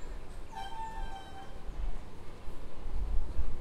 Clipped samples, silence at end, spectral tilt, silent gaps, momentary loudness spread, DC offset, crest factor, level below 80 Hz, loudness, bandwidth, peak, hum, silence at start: under 0.1%; 0 s; -5.5 dB/octave; none; 10 LU; under 0.1%; 14 dB; -38 dBFS; -44 LUFS; 7.8 kHz; -16 dBFS; none; 0 s